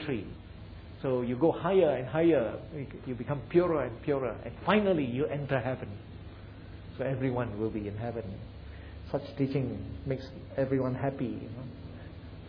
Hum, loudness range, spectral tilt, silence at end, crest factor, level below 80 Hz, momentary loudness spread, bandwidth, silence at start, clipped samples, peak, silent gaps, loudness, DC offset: none; 7 LU; -10 dB/octave; 0 s; 22 dB; -52 dBFS; 20 LU; 5.4 kHz; 0 s; under 0.1%; -10 dBFS; none; -31 LUFS; under 0.1%